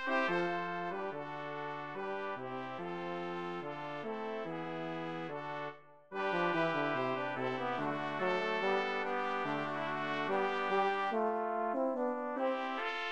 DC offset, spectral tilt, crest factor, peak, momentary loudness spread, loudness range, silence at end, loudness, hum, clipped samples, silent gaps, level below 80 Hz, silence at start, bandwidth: 0.1%; -6 dB/octave; 16 dB; -20 dBFS; 9 LU; 6 LU; 0 s; -36 LUFS; none; under 0.1%; none; -78 dBFS; 0 s; 9.4 kHz